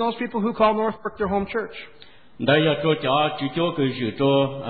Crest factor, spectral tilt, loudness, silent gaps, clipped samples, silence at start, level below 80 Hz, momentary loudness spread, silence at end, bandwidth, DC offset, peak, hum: 16 dB; -11 dB/octave; -22 LUFS; none; under 0.1%; 0 s; -52 dBFS; 9 LU; 0 s; 4.8 kHz; 0.4%; -6 dBFS; none